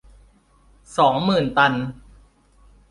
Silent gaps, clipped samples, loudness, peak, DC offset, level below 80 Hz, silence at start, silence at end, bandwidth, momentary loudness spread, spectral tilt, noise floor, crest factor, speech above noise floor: none; under 0.1%; -19 LUFS; -4 dBFS; under 0.1%; -50 dBFS; 0.9 s; 0.95 s; 11.5 kHz; 12 LU; -6 dB/octave; -55 dBFS; 20 dB; 37 dB